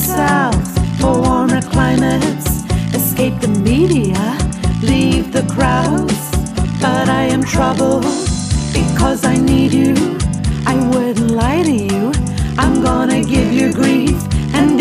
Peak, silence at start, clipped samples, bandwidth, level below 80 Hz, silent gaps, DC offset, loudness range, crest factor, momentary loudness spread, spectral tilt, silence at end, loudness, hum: 0 dBFS; 0 s; under 0.1%; 16 kHz; -24 dBFS; none; under 0.1%; 1 LU; 14 dB; 5 LU; -5.5 dB/octave; 0 s; -14 LUFS; none